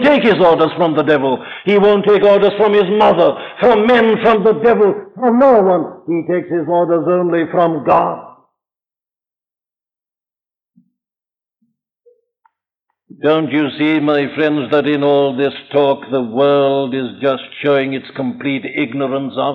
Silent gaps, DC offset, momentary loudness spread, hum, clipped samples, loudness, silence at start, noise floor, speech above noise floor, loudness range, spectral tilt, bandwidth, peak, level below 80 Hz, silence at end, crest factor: none; under 0.1%; 9 LU; none; under 0.1%; -14 LUFS; 0 s; under -90 dBFS; over 77 dB; 8 LU; -8 dB/octave; 5.8 kHz; -2 dBFS; -54 dBFS; 0 s; 14 dB